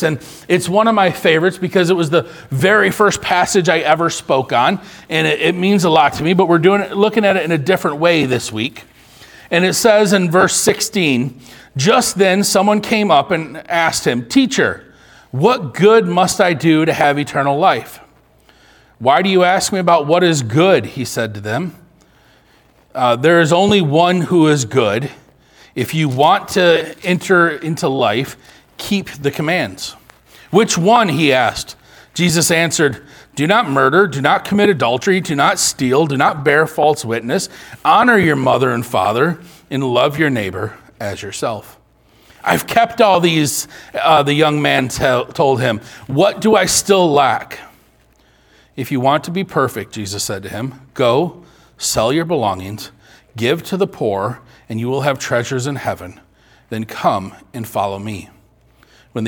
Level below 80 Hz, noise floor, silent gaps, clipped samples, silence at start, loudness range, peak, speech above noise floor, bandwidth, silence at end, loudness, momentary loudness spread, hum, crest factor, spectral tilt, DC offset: -50 dBFS; -52 dBFS; none; under 0.1%; 0 s; 6 LU; 0 dBFS; 38 dB; 19 kHz; 0 s; -14 LUFS; 13 LU; none; 16 dB; -4.5 dB/octave; under 0.1%